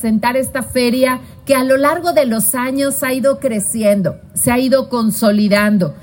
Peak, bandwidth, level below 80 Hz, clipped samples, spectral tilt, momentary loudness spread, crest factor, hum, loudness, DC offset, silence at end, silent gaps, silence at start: 0 dBFS; 17 kHz; -46 dBFS; under 0.1%; -4.5 dB/octave; 5 LU; 14 dB; none; -15 LUFS; under 0.1%; 0 s; none; 0 s